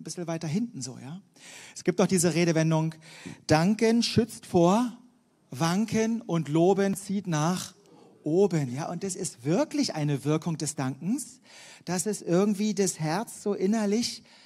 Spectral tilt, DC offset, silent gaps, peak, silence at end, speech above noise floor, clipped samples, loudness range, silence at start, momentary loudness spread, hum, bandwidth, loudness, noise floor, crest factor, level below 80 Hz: -5.5 dB/octave; under 0.1%; none; -8 dBFS; 0.25 s; 34 dB; under 0.1%; 4 LU; 0 s; 15 LU; none; 15.5 kHz; -27 LUFS; -61 dBFS; 20 dB; -64 dBFS